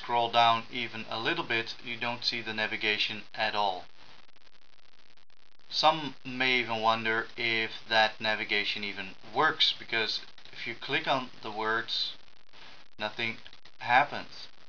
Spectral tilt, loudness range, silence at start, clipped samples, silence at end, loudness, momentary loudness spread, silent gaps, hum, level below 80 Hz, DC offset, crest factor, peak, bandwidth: -3.5 dB/octave; 5 LU; 0 s; under 0.1%; 0.2 s; -29 LUFS; 12 LU; none; none; -72 dBFS; 0.6%; 22 dB; -8 dBFS; 5.4 kHz